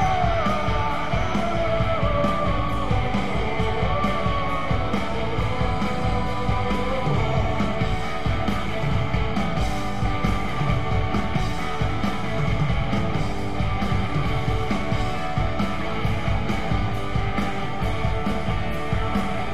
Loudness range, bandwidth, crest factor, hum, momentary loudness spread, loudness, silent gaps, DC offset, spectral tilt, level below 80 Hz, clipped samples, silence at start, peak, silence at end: 2 LU; 13.5 kHz; 14 dB; none; 3 LU; -25 LUFS; none; 4%; -6.5 dB/octave; -32 dBFS; under 0.1%; 0 s; -8 dBFS; 0 s